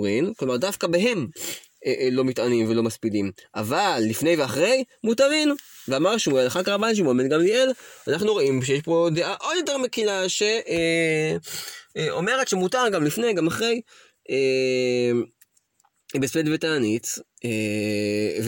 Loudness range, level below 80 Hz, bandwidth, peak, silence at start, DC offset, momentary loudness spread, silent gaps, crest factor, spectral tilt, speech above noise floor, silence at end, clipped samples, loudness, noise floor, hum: 3 LU; -64 dBFS; 17 kHz; -8 dBFS; 0 s; under 0.1%; 8 LU; none; 14 dB; -4.5 dB/octave; 44 dB; 0 s; under 0.1%; -23 LUFS; -67 dBFS; none